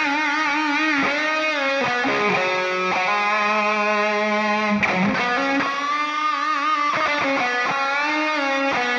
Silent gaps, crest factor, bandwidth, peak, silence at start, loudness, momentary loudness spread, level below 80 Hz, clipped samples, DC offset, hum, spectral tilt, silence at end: none; 12 dB; 9.6 kHz; -8 dBFS; 0 s; -20 LUFS; 2 LU; -62 dBFS; under 0.1%; under 0.1%; none; -4 dB/octave; 0 s